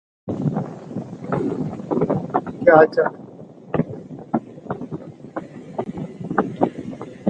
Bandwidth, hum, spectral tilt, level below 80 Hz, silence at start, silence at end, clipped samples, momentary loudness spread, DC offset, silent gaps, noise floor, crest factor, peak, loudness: 8.6 kHz; none; -9 dB/octave; -54 dBFS; 0.25 s; 0 s; under 0.1%; 18 LU; under 0.1%; none; -40 dBFS; 22 dB; 0 dBFS; -22 LUFS